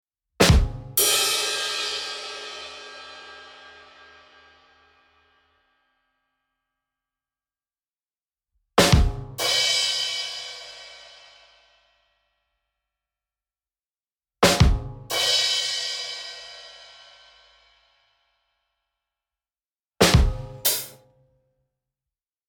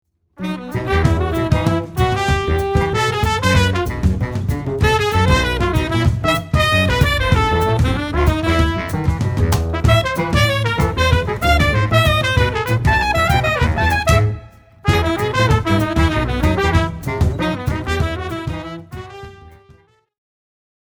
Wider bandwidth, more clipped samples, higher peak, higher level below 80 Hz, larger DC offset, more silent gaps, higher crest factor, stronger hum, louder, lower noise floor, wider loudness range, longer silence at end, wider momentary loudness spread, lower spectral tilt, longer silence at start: second, 18 kHz vs over 20 kHz; neither; about the same, -2 dBFS vs 0 dBFS; second, -34 dBFS vs -24 dBFS; neither; first, 14.12-14.16 s, 19.75-19.83 s vs none; first, 24 dB vs 16 dB; neither; second, -21 LUFS vs -17 LUFS; first, under -90 dBFS vs -50 dBFS; first, 16 LU vs 4 LU; first, 1.55 s vs 1.35 s; first, 23 LU vs 7 LU; second, -3 dB/octave vs -5.5 dB/octave; about the same, 0.4 s vs 0.4 s